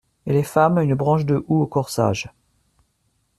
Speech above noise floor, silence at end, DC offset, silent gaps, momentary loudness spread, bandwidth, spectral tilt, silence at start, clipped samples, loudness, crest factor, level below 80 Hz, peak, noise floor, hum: 49 dB; 1.1 s; under 0.1%; none; 5 LU; 13.5 kHz; -7 dB/octave; 0.25 s; under 0.1%; -20 LUFS; 18 dB; -54 dBFS; -2 dBFS; -68 dBFS; none